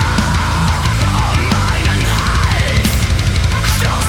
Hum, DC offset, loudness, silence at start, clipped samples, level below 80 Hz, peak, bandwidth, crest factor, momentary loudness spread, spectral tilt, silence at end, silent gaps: none; under 0.1%; -14 LUFS; 0 s; under 0.1%; -20 dBFS; -2 dBFS; over 20 kHz; 10 dB; 1 LU; -4.5 dB/octave; 0 s; none